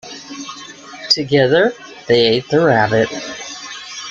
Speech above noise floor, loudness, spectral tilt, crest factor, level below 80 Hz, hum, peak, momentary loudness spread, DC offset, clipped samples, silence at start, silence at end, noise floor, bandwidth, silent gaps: 21 dB; -14 LUFS; -4.5 dB/octave; 16 dB; -54 dBFS; none; -2 dBFS; 18 LU; under 0.1%; under 0.1%; 0.05 s; 0 s; -35 dBFS; 7.8 kHz; none